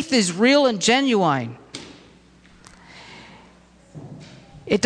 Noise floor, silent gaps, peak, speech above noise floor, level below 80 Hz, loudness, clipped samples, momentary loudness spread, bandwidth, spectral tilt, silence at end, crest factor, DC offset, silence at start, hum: -51 dBFS; none; -6 dBFS; 33 dB; -58 dBFS; -18 LUFS; under 0.1%; 26 LU; 10.5 kHz; -4 dB/octave; 0 s; 16 dB; under 0.1%; 0 s; none